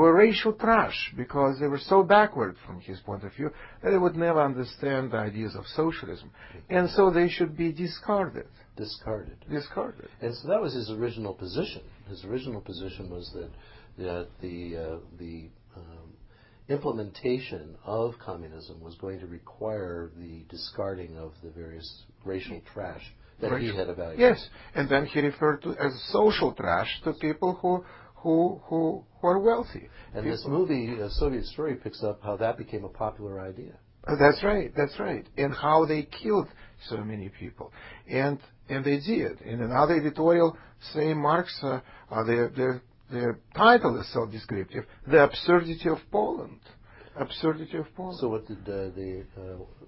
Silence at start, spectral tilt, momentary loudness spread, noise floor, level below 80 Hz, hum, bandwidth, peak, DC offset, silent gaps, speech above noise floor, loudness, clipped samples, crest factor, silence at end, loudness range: 0 s; -10.5 dB/octave; 20 LU; -54 dBFS; -50 dBFS; none; 5.8 kHz; -4 dBFS; under 0.1%; none; 26 dB; -27 LUFS; under 0.1%; 24 dB; 0 s; 12 LU